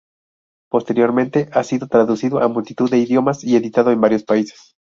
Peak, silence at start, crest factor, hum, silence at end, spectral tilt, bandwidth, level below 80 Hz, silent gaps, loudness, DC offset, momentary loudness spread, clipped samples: 0 dBFS; 0.75 s; 16 dB; none; 0.35 s; -7 dB/octave; 7.6 kHz; -60 dBFS; none; -17 LUFS; under 0.1%; 5 LU; under 0.1%